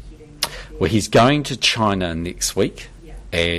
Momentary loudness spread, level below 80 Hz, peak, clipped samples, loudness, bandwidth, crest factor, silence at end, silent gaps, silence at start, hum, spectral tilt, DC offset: 11 LU; -38 dBFS; -4 dBFS; under 0.1%; -19 LUFS; 15.5 kHz; 16 dB; 0 s; none; 0 s; none; -4 dB/octave; under 0.1%